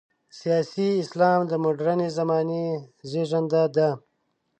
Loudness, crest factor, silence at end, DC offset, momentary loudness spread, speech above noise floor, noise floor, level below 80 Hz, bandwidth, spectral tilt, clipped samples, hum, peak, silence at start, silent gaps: -24 LUFS; 18 dB; 0.6 s; under 0.1%; 10 LU; 50 dB; -74 dBFS; -74 dBFS; 9 kHz; -7 dB/octave; under 0.1%; none; -8 dBFS; 0.35 s; none